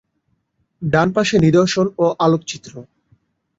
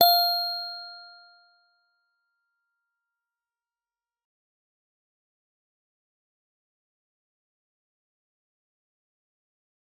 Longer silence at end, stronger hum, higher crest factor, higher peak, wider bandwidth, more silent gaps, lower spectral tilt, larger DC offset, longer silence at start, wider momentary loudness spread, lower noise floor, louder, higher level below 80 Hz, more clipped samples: second, 0.75 s vs 8.9 s; neither; second, 16 dB vs 30 dB; about the same, -2 dBFS vs -4 dBFS; second, 7.8 kHz vs 16.5 kHz; neither; first, -6 dB/octave vs 0 dB/octave; neither; first, 0.8 s vs 0 s; second, 16 LU vs 23 LU; second, -68 dBFS vs under -90 dBFS; first, -16 LUFS vs -23 LUFS; first, -50 dBFS vs under -90 dBFS; neither